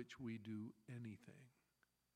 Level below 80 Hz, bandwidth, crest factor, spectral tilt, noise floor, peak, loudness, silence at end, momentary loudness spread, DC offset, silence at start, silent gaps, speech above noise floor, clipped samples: -86 dBFS; 14.5 kHz; 16 dB; -6.5 dB/octave; -84 dBFS; -38 dBFS; -54 LUFS; 0.65 s; 14 LU; under 0.1%; 0 s; none; 31 dB; under 0.1%